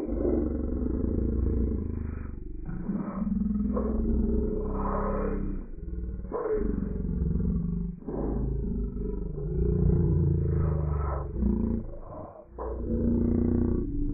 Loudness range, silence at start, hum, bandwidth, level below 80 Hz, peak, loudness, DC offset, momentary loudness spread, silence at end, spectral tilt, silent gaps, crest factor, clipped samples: 3 LU; 0 s; none; 2.5 kHz; -32 dBFS; -14 dBFS; -30 LUFS; under 0.1%; 12 LU; 0 s; -10 dB/octave; none; 14 dB; under 0.1%